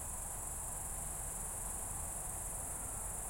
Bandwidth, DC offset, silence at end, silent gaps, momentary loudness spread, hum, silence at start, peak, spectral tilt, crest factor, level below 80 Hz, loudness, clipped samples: 16.5 kHz; under 0.1%; 0 s; none; 1 LU; none; 0 s; -30 dBFS; -3 dB/octave; 14 dB; -50 dBFS; -40 LUFS; under 0.1%